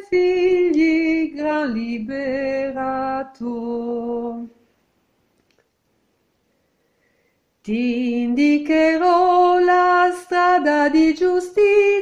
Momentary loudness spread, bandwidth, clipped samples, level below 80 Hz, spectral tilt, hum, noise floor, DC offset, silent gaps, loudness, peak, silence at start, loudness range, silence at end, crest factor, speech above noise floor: 12 LU; 11 kHz; under 0.1%; -54 dBFS; -5 dB/octave; none; -67 dBFS; under 0.1%; none; -18 LUFS; -4 dBFS; 0 s; 15 LU; 0 s; 14 dB; 49 dB